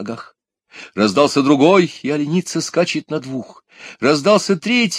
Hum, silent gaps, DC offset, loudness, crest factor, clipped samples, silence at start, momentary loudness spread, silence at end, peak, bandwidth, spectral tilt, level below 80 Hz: none; none; under 0.1%; -16 LUFS; 16 dB; under 0.1%; 0 s; 16 LU; 0 s; 0 dBFS; 13.5 kHz; -5 dB/octave; -64 dBFS